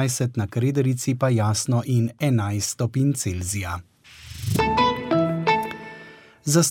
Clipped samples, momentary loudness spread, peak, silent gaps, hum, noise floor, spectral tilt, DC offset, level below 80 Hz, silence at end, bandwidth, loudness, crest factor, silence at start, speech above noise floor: under 0.1%; 12 LU; -8 dBFS; none; none; -45 dBFS; -5 dB/octave; under 0.1%; -48 dBFS; 0 s; 17 kHz; -23 LUFS; 16 dB; 0 s; 23 dB